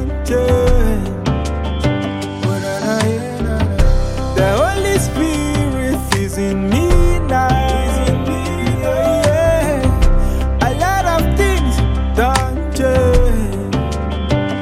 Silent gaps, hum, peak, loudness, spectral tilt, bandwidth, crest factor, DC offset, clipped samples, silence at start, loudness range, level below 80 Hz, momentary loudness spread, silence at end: none; none; 0 dBFS; -16 LUFS; -6 dB/octave; 15.5 kHz; 14 dB; under 0.1%; under 0.1%; 0 s; 2 LU; -18 dBFS; 6 LU; 0 s